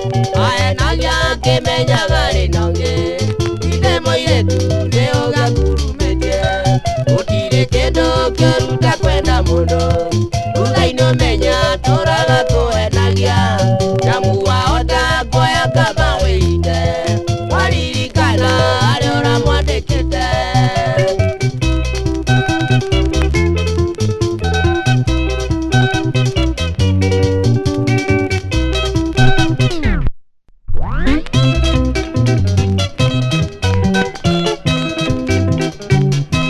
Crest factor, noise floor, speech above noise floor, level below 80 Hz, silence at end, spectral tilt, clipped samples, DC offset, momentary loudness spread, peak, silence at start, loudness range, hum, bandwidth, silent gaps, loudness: 14 dB; -43 dBFS; 30 dB; -22 dBFS; 0 s; -5.5 dB/octave; under 0.1%; under 0.1%; 4 LU; 0 dBFS; 0 s; 2 LU; none; 12.5 kHz; none; -15 LUFS